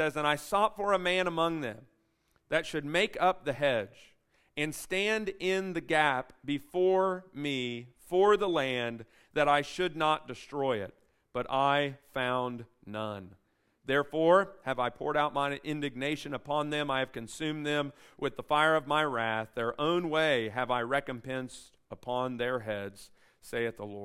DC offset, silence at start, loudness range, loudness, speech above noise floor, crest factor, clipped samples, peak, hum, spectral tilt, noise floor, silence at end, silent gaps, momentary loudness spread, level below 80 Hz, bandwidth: under 0.1%; 0 s; 4 LU; -31 LUFS; 42 dB; 20 dB; under 0.1%; -10 dBFS; none; -5 dB/octave; -73 dBFS; 0 s; none; 12 LU; -62 dBFS; 16 kHz